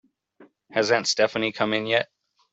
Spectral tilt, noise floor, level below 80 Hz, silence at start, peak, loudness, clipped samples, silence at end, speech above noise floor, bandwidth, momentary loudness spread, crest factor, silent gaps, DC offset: -3 dB/octave; -56 dBFS; -68 dBFS; 0.4 s; -4 dBFS; -23 LUFS; under 0.1%; 0.5 s; 33 dB; 8.2 kHz; 6 LU; 22 dB; none; under 0.1%